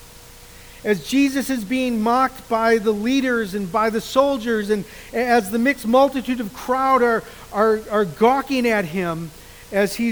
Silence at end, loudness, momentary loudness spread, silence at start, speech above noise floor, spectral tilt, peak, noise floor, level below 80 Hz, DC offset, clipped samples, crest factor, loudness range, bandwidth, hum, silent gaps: 0 s; -20 LUFS; 8 LU; 0 s; 23 dB; -5 dB/octave; -2 dBFS; -43 dBFS; -48 dBFS; 0.1%; under 0.1%; 18 dB; 1 LU; over 20 kHz; none; none